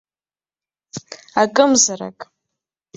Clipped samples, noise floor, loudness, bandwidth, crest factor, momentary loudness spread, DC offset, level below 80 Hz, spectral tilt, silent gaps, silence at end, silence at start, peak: under 0.1%; under -90 dBFS; -15 LUFS; 8.4 kHz; 20 dB; 21 LU; under 0.1%; -66 dBFS; -2 dB/octave; none; 0.75 s; 0.95 s; -2 dBFS